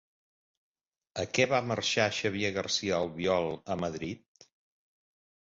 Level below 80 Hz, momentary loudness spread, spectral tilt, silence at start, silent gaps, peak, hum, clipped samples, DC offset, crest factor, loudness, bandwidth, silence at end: -60 dBFS; 11 LU; -4 dB/octave; 1.15 s; none; -10 dBFS; none; under 0.1%; under 0.1%; 24 dB; -30 LUFS; 7.8 kHz; 1.35 s